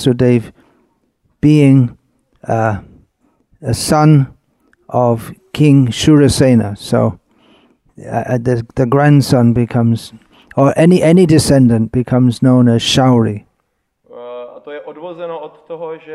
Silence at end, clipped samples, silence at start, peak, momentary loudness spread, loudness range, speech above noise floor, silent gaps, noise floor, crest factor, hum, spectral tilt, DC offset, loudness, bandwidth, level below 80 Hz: 0 s; under 0.1%; 0 s; 0 dBFS; 19 LU; 5 LU; 55 dB; none; -67 dBFS; 12 dB; none; -6.5 dB/octave; under 0.1%; -12 LUFS; 13.5 kHz; -40 dBFS